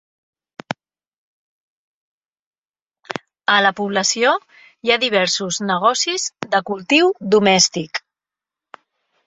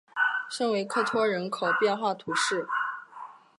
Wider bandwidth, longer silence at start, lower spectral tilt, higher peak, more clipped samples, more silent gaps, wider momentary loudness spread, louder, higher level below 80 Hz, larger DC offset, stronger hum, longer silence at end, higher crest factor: second, 8.4 kHz vs 11.5 kHz; first, 0.7 s vs 0.15 s; about the same, -2.5 dB/octave vs -3 dB/octave; first, 0 dBFS vs -12 dBFS; neither; first, 1.08-1.12 s, 1.18-2.21 s, 2.32-2.62 s, 2.69-2.74 s, 2.82-2.86 s vs none; first, 17 LU vs 8 LU; first, -17 LUFS vs -27 LUFS; first, -64 dBFS vs -80 dBFS; neither; neither; first, 1.3 s vs 0.25 s; about the same, 20 dB vs 16 dB